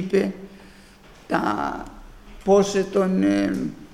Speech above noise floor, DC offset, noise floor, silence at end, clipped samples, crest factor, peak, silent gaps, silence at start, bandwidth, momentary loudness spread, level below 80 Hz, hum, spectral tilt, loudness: 27 dB; under 0.1%; -48 dBFS; 0 s; under 0.1%; 16 dB; -6 dBFS; none; 0 s; 14 kHz; 18 LU; -48 dBFS; none; -6 dB/octave; -22 LUFS